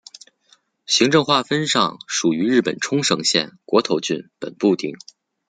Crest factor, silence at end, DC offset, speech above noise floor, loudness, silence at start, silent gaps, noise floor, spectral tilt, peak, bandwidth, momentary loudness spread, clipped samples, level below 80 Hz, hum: 18 dB; 0.55 s; under 0.1%; 39 dB; -19 LUFS; 0.9 s; none; -59 dBFS; -3.5 dB/octave; -2 dBFS; 9.6 kHz; 8 LU; under 0.1%; -64 dBFS; none